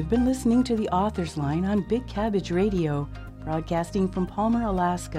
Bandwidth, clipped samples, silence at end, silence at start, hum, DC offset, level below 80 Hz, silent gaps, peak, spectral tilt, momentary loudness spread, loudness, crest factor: 14 kHz; under 0.1%; 0 s; 0 s; none; under 0.1%; -40 dBFS; none; -10 dBFS; -7 dB/octave; 7 LU; -25 LUFS; 14 dB